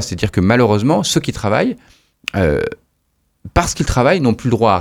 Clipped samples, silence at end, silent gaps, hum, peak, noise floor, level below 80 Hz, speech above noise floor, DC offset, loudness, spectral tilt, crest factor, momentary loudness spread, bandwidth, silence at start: under 0.1%; 0 s; none; none; 0 dBFS; -64 dBFS; -32 dBFS; 50 dB; under 0.1%; -16 LUFS; -5.5 dB/octave; 16 dB; 8 LU; 17.5 kHz; 0 s